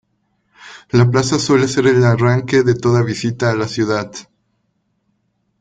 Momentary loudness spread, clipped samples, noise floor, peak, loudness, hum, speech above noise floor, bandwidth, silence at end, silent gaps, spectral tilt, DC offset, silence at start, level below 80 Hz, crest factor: 7 LU; under 0.1%; -66 dBFS; -2 dBFS; -15 LUFS; none; 52 dB; 9.2 kHz; 1.4 s; none; -6 dB/octave; under 0.1%; 0.6 s; -50 dBFS; 14 dB